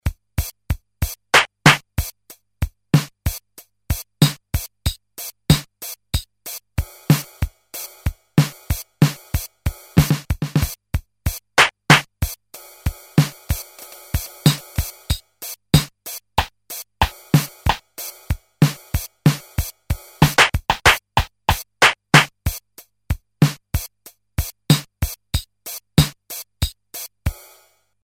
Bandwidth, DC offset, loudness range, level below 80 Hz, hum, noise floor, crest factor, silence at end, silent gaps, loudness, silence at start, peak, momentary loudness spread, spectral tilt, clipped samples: 17 kHz; under 0.1%; 6 LU; -32 dBFS; none; -56 dBFS; 22 dB; 0.7 s; none; -20 LUFS; 0.05 s; 0 dBFS; 17 LU; -4 dB/octave; under 0.1%